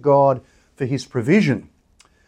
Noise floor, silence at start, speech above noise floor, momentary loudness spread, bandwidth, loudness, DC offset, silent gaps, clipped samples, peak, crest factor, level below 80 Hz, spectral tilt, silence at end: -56 dBFS; 0.05 s; 39 dB; 11 LU; 11 kHz; -20 LUFS; under 0.1%; none; under 0.1%; -4 dBFS; 16 dB; -60 dBFS; -7.5 dB/octave; 0.65 s